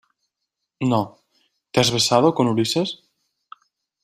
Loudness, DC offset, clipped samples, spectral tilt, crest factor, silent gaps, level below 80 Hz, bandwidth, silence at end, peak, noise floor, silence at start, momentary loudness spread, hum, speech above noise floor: -20 LUFS; under 0.1%; under 0.1%; -4.5 dB/octave; 20 dB; none; -58 dBFS; 15.5 kHz; 1.1 s; -2 dBFS; -81 dBFS; 0.8 s; 11 LU; none; 62 dB